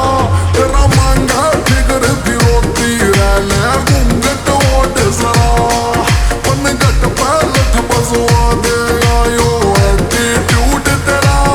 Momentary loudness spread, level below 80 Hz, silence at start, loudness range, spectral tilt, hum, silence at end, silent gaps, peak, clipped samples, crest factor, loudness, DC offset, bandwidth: 2 LU; -16 dBFS; 0 s; 1 LU; -4.5 dB/octave; none; 0 s; none; 0 dBFS; under 0.1%; 10 dB; -11 LUFS; under 0.1%; over 20 kHz